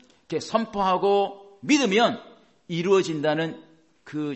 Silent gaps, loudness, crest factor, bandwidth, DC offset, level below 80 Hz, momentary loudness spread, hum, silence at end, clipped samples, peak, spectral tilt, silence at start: none; -24 LUFS; 18 dB; 8.4 kHz; under 0.1%; -64 dBFS; 14 LU; none; 0 s; under 0.1%; -6 dBFS; -4.5 dB/octave; 0.3 s